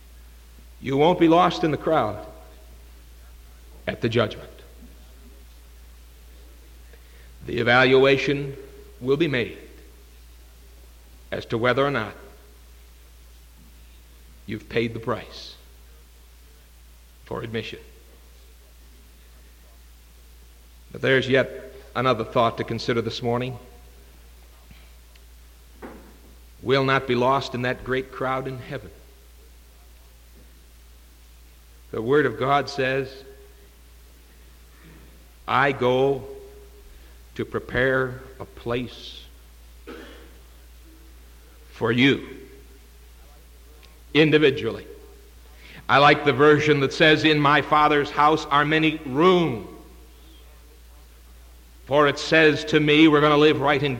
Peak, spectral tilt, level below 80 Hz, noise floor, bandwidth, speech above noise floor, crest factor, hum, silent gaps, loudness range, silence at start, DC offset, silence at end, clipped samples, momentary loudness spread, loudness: -6 dBFS; -6 dB/octave; -48 dBFS; -49 dBFS; 17 kHz; 28 dB; 20 dB; none; none; 16 LU; 0.8 s; under 0.1%; 0 s; under 0.1%; 23 LU; -21 LUFS